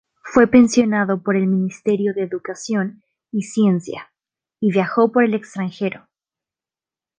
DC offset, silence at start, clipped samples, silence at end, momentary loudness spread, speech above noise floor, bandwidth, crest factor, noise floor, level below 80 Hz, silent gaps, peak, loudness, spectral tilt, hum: under 0.1%; 0.25 s; under 0.1%; 1.2 s; 14 LU; over 72 dB; 9.6 kHz; 18 dB; under -90 dBFS; -60 dBFS; none; -2 dBFS; -19 LUFS; -6.5 dB/octave; none